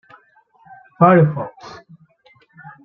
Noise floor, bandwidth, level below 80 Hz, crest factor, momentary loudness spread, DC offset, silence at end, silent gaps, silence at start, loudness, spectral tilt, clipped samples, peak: -55 dBFS; 6.2 kHz; -62 dBFS; 18 dB; 27 LU; under 0.1%; 0.15 s; none; 1 s; -15 LUFS; -10 dB/octave; under 0.1%; -2 dBFS